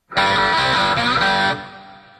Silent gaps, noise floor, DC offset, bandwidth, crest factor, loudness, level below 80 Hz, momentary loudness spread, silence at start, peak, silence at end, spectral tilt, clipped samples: none; -41 dBFS; under 0.1%; 13 kHz; 14 dB; -16 LUFS; -46 dBFS; 8 LU; 0.1 s; -4 dBFS; 0.2 s; -3.5 dB/octave; under 0.1%